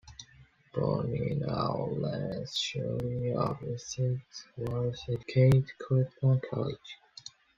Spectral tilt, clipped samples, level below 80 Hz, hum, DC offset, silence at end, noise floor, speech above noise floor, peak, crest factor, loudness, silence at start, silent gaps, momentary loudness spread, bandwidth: -6.5 dB/octave; under 0.1%; -56 dBFS; none; under 0.1%; 0.3 s; -60 dBFS; 29 dB; -12 dBFS; 18 dB; -31 LUFS; 0.05 s; none; 18 LU; 7.6 kHz